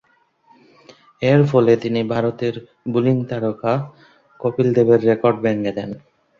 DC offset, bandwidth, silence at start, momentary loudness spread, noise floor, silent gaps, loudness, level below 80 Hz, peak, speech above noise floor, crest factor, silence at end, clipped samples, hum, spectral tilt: under 0.1%; 7.2 kHz; 1.2 s; 12 LU; -57 dBFS; none; -18 LUFS; -58 dBFS; -2 dBFS; 39 dB; 16 dB; 0.4 s; under 0.1%; none; -8.5 dB/octave